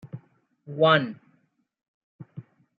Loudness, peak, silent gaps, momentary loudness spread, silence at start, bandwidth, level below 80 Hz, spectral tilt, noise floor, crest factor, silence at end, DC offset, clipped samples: -22 LUFS; -6 dBFS; 1.88-2.19 s; 26 LU; 0.05 s; 5 kHz; -76 dBFS; -8 dB/octave; -69 dBFS; 24 dB; 0.35 s; under 0.1%; under 0.1%